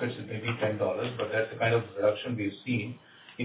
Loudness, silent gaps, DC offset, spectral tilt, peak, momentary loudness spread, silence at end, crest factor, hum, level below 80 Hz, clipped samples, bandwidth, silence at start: -30 LUFS; none; under 0.1%; -5 dB/octave; -14 dBFS; 7 LU; 0 s; 16 dB; none; -64 dBFS; under 0.1%; 4 kHz; 0 s